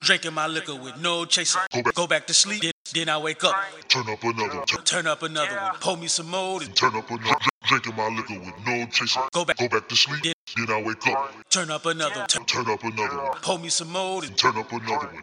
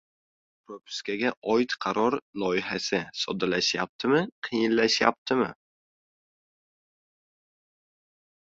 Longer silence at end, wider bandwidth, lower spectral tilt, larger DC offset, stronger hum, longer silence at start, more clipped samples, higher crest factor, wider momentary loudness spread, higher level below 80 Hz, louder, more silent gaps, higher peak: second, 0 s vs 2.95 s; first, 16.5 kHz vs 7.8 kHz; second, -1.5 dB/octave vs -4 dB/octave; neither; neither; second, 0 s vs 0.7 s; neither; about the same, 22 dB vs 24 dB; about the same, 8 LU vs 9 LU; about the same, -66 dBFS vs -68 dBFS; first, -23 LUFS vs -26 LUFS; about the same, 1.67-1.71 s, 2.72-2.85 s, 7.50-7.61 s, 10.33-10.47 s vs 1.37-1.42 s, 2.22-2.33 s, 3.89-3.99 s, 4.32-4.42 s, 5.18-5.26 s; about the same, -2 dBFS vs -4 dBFS